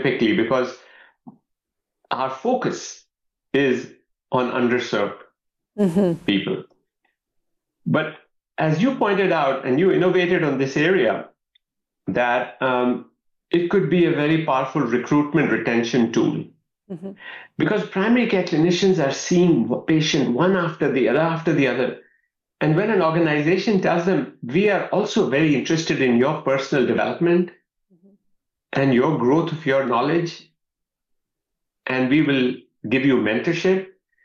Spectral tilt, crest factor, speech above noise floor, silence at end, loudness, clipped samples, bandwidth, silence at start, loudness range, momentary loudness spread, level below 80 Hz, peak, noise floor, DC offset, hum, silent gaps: -6 dB/octave; 14 dB; 63 dB; 0.35 s; -20 LUFS; under 0.1%; 7.6 kHz; 0 s; 5 LU; 11 LU; -62 dBFS; -8 dBFS; -82 dBFS; under 0.1%; none; none